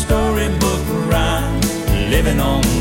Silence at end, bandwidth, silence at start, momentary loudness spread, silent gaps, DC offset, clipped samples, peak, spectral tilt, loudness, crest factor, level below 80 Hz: 0 s; 16.5 kHz; 0 s; 3 LU; none; under 0.1%; under 0.1%; -2 dBFS; -5 dB/octave; -17 LUFS; 14 dB; -22 dBFS